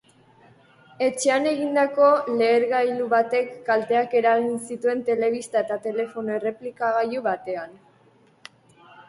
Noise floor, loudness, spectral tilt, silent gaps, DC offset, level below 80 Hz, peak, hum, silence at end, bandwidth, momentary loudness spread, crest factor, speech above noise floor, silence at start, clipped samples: -57 dBFS; -23 LUFS; -4 dB/octave; none; under 0.1%; -72 dBFS; -6 dBFS; none; 0.1 s; 11.5 kHz; 9 LU; 16 dB; 35 dB; 1 s; under 0.1%